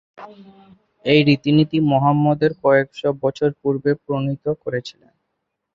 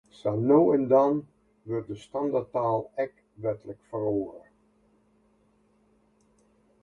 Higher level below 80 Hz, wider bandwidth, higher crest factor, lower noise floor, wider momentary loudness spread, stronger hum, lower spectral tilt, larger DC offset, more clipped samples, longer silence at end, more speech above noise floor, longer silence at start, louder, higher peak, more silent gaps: first, -60 dBFS vs -66 dBFS; second, 7.6 kHz vs 9.2 kHz; about the same, 18 dB vs 20 dB; first, -76 dBFS vs -66 dBFS; second, 10 LU vs 14 LU; neither; second, -8 dB/octave vs -9.5 dB/octave; neither; neither; second, 0.85 s vs 2.45 s; first, 57 dB vs 40 dB; about the same, 0.2 s vs 0.25 s; first, -19 LUFS vs -27 LUFS; first, -2 dBFS vs -8 dBFS; neither